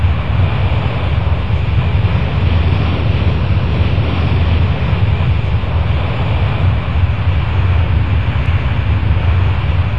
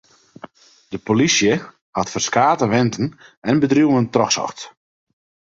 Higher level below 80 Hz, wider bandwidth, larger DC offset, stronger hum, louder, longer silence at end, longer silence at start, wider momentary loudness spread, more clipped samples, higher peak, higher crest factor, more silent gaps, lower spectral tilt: first, -18 dBFS vs -54 dBFS; second, 5.6 kHz vs 7.8 kHz; first, 6% vs under 0.1%; neither; first, -15 LUFS vs -18 LUFS; second, 0 s vs 0.75 s; second, 0 s vs 0.9 s; second, 2 LU vs 14 LU; neither; about the same, -2 dBFS vs -2 dBFS; second, 12 dB vs 18 dB; second, none vs 1.81-1.93 s, 3.37-3.42 s; first, -9 dB/octave vs -4.5 dB/octave